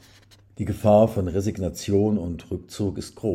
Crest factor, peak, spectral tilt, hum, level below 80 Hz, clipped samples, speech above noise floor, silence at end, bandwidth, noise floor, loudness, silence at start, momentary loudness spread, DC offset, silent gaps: 18 dB; -6 dBFS; -7.5 dB/octave; none; -50 dBFS; under 0.1%; 30 dB; 0 s; 16 kHz; -53 dBFS; -24 LUFS; 0.6 s; 14 LU; under 0.1%; none